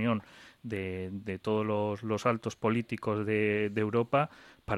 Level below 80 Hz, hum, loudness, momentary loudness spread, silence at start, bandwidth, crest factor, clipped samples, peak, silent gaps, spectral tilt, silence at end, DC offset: -62 dBFS; none; -32 LUFS; 9 LU; 0 s; 12.5 kHz; 18 dB; under 0.1%; -12 dBFS; none; -7 dB/octave; 0 s; under 0.1%